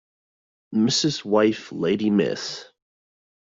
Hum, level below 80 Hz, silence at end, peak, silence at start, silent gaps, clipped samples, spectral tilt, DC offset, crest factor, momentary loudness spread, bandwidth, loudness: none; -64 dBFS; 0.8 s; -6 dBFS; 0.7 s; none; under 0.1%; -4.5 dB/octave; under 0.1%; 18 dB; 10 LU; 7.8 kHz; -22 LUFS